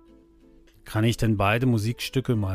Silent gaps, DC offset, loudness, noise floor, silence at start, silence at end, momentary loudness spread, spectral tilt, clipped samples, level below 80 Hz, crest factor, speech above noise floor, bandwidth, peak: none; under 0.1%; -24 LUFS; -54 dBFS; 0.85 s; 0 s; 6 LU; -6.5 dB/octave; under 0.1%; -44 dBFS; 16 dB; 31 dB; 15.5 kHz; -10 dBFS